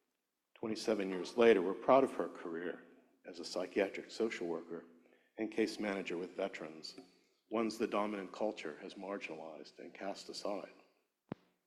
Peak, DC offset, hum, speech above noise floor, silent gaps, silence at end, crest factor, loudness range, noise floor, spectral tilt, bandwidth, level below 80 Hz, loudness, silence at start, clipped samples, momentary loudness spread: -14 dBFS; under 0.1%; none; 50 dB; none; 0.95 s; 24 dB; 8 LU; -87 dBFS; -5 dB/octave; 13 kHz; -80 dBFS; -37 LUFS; 0.6 s; under 0.1%; 21 LU